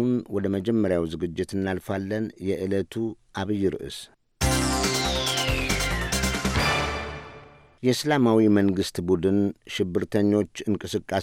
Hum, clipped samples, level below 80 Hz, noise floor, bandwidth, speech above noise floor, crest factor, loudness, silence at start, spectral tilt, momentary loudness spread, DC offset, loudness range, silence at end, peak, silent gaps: none; under 0.1%; -38 dBFS; -48 dBFS; 17 kHz; 24 dB; 16 dB; -25 LUFS; 0 s; -4.5 dB/octave; 8 LU; under 0.1%; 5 LU; 0 s; -8 dBFS; none